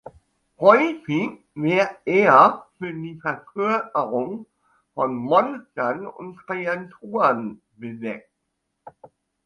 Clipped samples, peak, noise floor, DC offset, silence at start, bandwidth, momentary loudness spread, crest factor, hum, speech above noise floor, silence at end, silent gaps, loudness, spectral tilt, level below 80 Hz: under 0.1%; 0 dBFS; -77 dBFS; under 0.1%; 0.6 s; 10 kHz; 18 LU; 22 dB; none; 55 dB; 0.4 s; none; -21 LUFS; -7 dB/octave; -68 dBFS